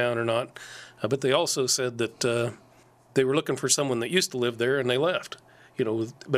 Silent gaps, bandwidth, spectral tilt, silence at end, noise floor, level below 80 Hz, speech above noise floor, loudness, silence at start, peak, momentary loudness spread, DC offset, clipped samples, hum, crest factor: none; 15.5 kHz; -3.5 dB/octave; 0 s; -57 dBFS; -70 dBFS; 31 dB; -26 LUFS; 0 s; -8 dBFS; 12 LU; under 0.1%; under 0.1%; none; 20 dB